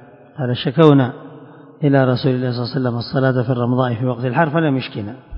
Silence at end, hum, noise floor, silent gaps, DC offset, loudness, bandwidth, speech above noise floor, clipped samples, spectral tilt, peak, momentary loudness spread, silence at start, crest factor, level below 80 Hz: 0 s; none; -40 dBFS; none; under 0.1%; -17 LUFS; 5.4 kHz; 23 dB; under 0.1%; -10 dB/octave; 0 dBFS; 12 LU; 0.35 s; 18 dB; -54 dBFS